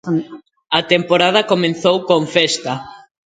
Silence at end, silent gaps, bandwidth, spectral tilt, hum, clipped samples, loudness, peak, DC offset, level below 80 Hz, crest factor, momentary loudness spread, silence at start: 0.25 s; none; 9.4 kHz; -4 dB/octave; none; under 0.1%; -15 LUFS; 0 dBFS; under 0.1%; -58 dBFS; 16 dB; 10 LU; 0.05 s